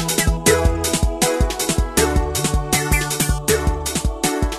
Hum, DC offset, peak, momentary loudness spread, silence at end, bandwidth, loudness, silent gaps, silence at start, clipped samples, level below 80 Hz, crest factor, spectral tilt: none; under 0.1%; -2 dBFS; 5 LU; 0 s; 13.5 kHz; -19 LUFS; none; 0 s; under 0.1%; -24 dBFS; 16 dB; -3.5 dB/octave